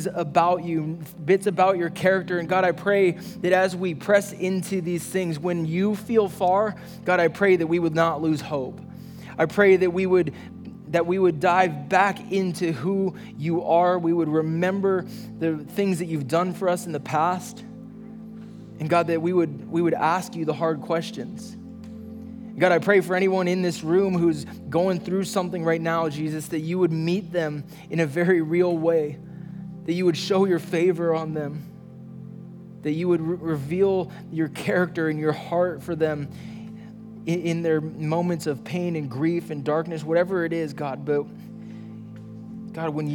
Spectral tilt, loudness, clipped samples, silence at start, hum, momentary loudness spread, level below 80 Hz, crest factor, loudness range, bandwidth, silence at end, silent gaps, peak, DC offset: -6.5 dB/octave; -24 LUFS; under 0.1%; 0 s; none; 18 LU; -64 dBFS; 18 dB; 5 LU; 19 kHz; 0 s; none; -4 dBFS; under 0.1%